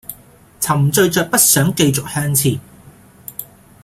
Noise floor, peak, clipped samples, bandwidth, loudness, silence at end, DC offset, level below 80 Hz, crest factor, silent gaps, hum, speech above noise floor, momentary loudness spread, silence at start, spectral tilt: -44 dBFS; 0 dBFS; under 0.1%; 16.5 kHz; -14 LUFS; 0.4 s; under 0.1%; -48 dBFS; 18 dB; none; none; 30 dB; 20 LU; 0.1 s; -4 dB/octave